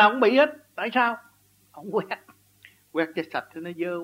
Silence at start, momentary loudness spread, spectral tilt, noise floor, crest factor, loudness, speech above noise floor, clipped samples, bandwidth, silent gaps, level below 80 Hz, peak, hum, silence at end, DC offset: 0 s; 17 LU; -5.5 dB/octave; -56 dBFS; 20 dB; -25 LUFS; 32 dB; under 0.1%; 16 kHz; none; -78 dBFS; -6 dBFS; 50 Hz at -70 dBFS; 0 s; under 0.1%